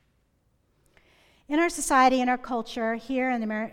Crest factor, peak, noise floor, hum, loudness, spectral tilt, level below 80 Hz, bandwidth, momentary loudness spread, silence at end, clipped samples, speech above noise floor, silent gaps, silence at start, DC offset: 18 dB; -8 dBFS; -69 dBFS; none; -25 LUFS; -3 dB/octave; -56 dBFS; 16.5 kHz; 9 LU; 0 s; under 0.1%; 44 dB; none; 1.5 s; under 0.1%